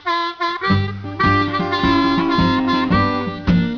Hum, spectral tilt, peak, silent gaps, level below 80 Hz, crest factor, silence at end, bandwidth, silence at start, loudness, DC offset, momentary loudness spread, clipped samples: none; -7 dB/octave; -4 dBFS; none; -34 dBFS; 14 dB; 0 s; 5.4 kHz; 0.05 s; -17 LUFS; under 0.1%; 5 LU; under 0.1%